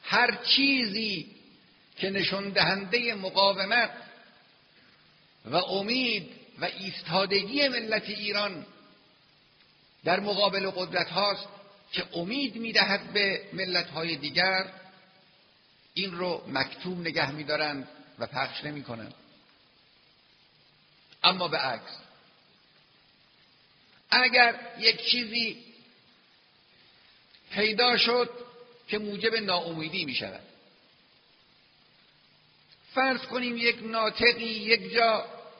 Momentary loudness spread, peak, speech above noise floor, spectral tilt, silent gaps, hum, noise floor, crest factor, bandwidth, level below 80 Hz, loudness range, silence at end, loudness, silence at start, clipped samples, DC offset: 13 LU; -4 dBFS; 34 dB; -0.5 dB/octave; none; none; -62 dBFS; 26 dB; 6.4 kHz; -70 dBFS; 7 LU; 0.05 s; -26 LUFS; 0.05 s; under 0.1%; under 0.1%